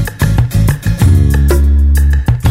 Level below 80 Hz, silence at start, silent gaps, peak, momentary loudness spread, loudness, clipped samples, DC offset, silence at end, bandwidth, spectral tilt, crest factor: -12 dBFS; 0 s; none; 0 dBFS; 3 LU; -11 LUFS; under 0.1%; under 0.1%; 0 s; 16 kHz; -6.5 dB/octave; 8 dB